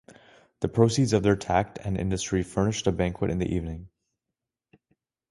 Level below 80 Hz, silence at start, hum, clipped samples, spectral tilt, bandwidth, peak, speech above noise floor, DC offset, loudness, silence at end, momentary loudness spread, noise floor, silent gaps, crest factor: -44 dBFS; 0.6 s; none; under 0.1%; -6 dB/octave; 11.5 kHz; -6 dBFS; 62 dB; under 0.1%; -26 LUFS; 1.45 s; 9 LU; -87 dBFS; none; 22 dB